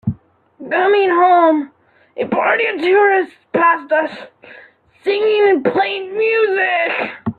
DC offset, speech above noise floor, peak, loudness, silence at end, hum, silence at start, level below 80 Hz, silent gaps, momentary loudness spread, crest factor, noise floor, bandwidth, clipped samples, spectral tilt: under 0.1%; 27 dB; -2 dBFS; -15 LUFS; 0.05 s; none; 0.05 s; -56 dBFS; none; 13 LU; 14 dB; -42 dBFS; 4.8 kHz; under 0.1%; -7.5 dB/octave